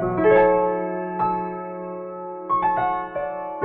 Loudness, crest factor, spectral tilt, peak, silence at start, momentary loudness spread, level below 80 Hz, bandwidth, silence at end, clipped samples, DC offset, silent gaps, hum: -22 LUFS; 16 dB; -10 dB/octave; -6 dBFS; 0 s; 16 LU; -50 dBFS; 4.2 kHz; 0 s; under 0.1%; under 0.1%; none; none